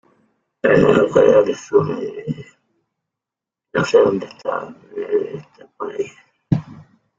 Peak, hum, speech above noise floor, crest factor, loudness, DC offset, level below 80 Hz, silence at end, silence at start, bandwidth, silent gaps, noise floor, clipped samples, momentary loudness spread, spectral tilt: 0 dBFS; none; 70 dB; 18 dB; -18 LUFS; under 0.1%; -52 dBFS; 0.4 s; 0.65 s; 7.6 kHz; none; -87 dBFS; under 0.1%; 17 LU; -6.5 dB/octave